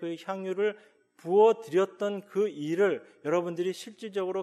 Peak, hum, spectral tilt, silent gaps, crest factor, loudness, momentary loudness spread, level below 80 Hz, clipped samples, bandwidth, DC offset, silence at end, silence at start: -12 dBFS; none; -6 dB/octave; none; 16 dB; -29 LUFS; 13 LU; under -90 dBFS; under 0.1%; 12.5 kHz; under 0.1%; 0 s; 0 s